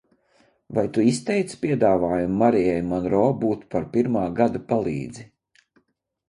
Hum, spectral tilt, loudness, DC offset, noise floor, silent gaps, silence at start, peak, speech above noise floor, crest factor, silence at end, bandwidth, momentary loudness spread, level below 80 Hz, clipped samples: none; -7 dB/octave; -22 LUFS; under 0.1%; -71 dBFS; none; 0.7 s; -4 dBFS; 50 dB; 18 dB; 1.05 s; 11 kHz; 8 LU; -52 dBFS; under 0.1%